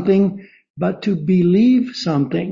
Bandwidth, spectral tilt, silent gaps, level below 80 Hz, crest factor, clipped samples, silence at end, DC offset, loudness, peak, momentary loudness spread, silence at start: 7.4 kHz; -8 dB/octave; 0.70-0.74 s; -56 dBFS; 12 dB; under 0.1%; 0 s; under 0.1%; -17 LUFS; -4 dBFS; 10 LU; 0 s